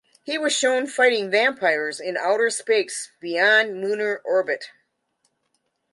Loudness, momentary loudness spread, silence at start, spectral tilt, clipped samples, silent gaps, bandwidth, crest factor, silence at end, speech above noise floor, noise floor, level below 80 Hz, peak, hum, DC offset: -21 LUFS; 11 LU; 0.25 s; -1.5 dB/octave; under 0.1%; none; 11.5 kHz; 18 dB; 1.25 s; 51 dB; -73 dBFS; -80 dBFS; -6 dBFS; none; under 0.1%